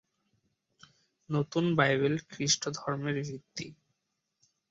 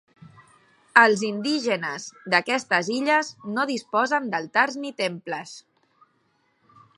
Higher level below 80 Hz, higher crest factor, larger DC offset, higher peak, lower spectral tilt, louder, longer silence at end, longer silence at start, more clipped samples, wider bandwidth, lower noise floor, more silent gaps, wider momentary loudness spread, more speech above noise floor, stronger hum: first, -70 dBFS vs -78 dBFS; about the same, 22 dB vs 24 dB; neither; second, -12 dBFS vs 0 dBFS; about the same, -4 dB/octave vs -3.5 dB/octave; second, -30 LUFS vs -23 LUFS; second, 1 s vs 1.4 s; first, 1.3 s vs 0.95 s; neither; second, 7.8 kHz vs 11.5 kHz; first, -82 dBFS vs -68 dBFS; neither; about the same, 15 LU vs 15 LU; first, 52 dB vs 44 dB; neither